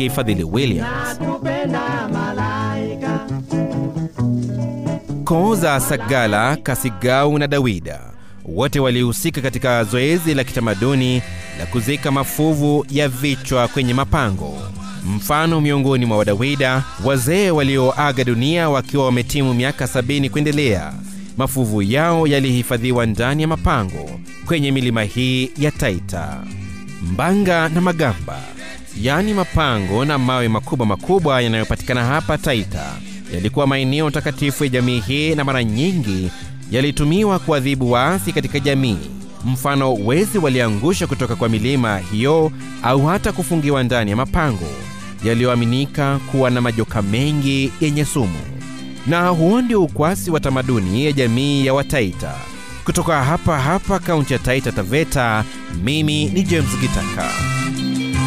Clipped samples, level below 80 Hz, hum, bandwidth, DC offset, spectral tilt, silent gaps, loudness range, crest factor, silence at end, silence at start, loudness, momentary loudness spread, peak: under 0.1%; -36 dBFS; none; 16 kHz; 2%; -5.5 dB/octave; none; 3 LU; 12 dB; 0 s; 0 s; -18 LUFS; 9 LU; -4 dBFS